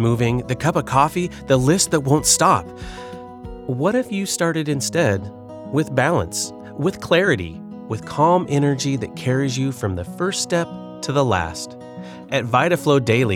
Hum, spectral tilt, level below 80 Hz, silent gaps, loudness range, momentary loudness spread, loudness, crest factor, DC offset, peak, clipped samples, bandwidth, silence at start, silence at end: none; -4.5 dB/octave; -46 dBFS; none; 4 LU; 17 LU; -20 LUFS; 16 dB; under 0.1%; -4 dBFS; under 0.1%; 18 kHz; 0 s; 0 s